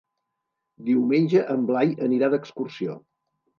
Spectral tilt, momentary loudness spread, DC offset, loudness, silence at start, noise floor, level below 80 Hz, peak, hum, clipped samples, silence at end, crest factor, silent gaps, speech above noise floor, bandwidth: -8.5 dB/octave; 13 LU; under 0.1%; -23 LUFS; 0.8 s; -81 dBFS; -78 dBFS; -8 dBFS; none; under 0.1%; 0.6 s; 16 dB; none; 58 dB; 6.8 kHz